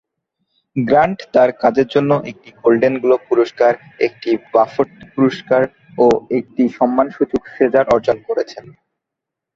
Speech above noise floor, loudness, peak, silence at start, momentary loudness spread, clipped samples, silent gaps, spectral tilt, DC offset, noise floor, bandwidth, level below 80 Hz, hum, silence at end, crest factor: 67 dB; -16 LUFS; 0 dBFS; 0.75 s; 7 LU; under 0.1%; none; -7.5 dB/octave; under 0.1%; -82 dBFS; 7.6 kHz; -54 dBFS; none; 0.95 s; 16 dB